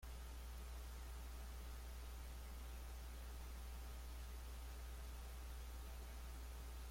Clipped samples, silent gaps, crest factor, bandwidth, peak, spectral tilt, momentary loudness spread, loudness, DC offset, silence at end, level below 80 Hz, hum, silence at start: under 0.1%; none; 8 dB; 16.5 kHz; -42 dBFS; -4.5 dB/octave; 0 LU; -54 LUFS; under 0.1%; 0 s; -52 dBFS; none; 0 s